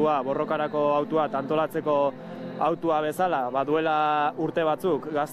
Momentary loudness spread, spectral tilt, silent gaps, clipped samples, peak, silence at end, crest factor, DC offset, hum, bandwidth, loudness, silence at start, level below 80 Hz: 4 LU; -6.5 dB/octave; none; under 0.1%; -12 dBFS; 0 s; 12 dB; under 0.1%; none; 14.5 kHz; -25 LUFS; 0 s; -68 dBFS